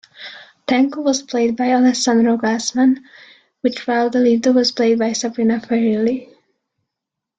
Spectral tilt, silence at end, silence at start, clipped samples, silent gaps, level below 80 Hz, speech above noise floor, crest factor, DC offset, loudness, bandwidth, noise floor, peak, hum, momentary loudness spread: -4 dB/octave; 1.15 s; 0.2 s; under 0.1%; none; -62 dBFS; 66 dB; 14 dB; under 0.1%; -17 LUFS; 9.2 kHz; -82 dBFS; -4 dBFS; none; 9 LU